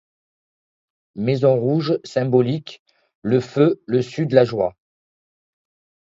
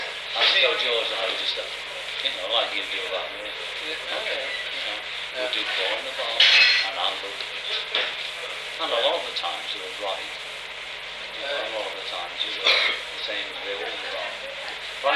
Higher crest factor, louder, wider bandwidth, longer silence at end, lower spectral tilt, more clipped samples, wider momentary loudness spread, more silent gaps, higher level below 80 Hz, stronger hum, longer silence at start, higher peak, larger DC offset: about the same, 20 dB vs 20 dB; first, -19 LUFS vs -24 LUFS; second, 7.8 kHz vs 14.5 kHz; first, 1.4 s vs 0 s; first, -8 dB/octave vs 0 dB/octave; neither; second, 10 LU vs 13 LU; first, 2.79-2.86 s, 3.15-3.22 s vs none; about the same, -60 dBFS vs -62 dBFS; neither; first, 1.15 s vs 0 s; first, 0 dBFS vs -6 dBFS; neither